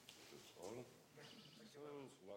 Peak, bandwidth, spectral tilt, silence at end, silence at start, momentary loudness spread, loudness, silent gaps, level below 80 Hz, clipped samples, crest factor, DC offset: -40 dBFS; 16.5 kHz; -4 dB/octave; 0 s; 0 s; 6 LU; -58 LUFS; none; -90 dBFS; under 0.1%; 18 dB; under 0.1%